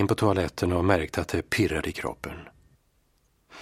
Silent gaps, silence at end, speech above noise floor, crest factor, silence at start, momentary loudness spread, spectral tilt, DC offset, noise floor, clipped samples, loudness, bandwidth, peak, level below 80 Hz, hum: none; 0 s; 41 dB; 22 dB; 0 s; 14 LU; -6 dB/octave; under 0.1%; -67 dBFS; under 0.1%; -26 LUFS; 16 kHz; -6 dBFS; -46 dBFS; none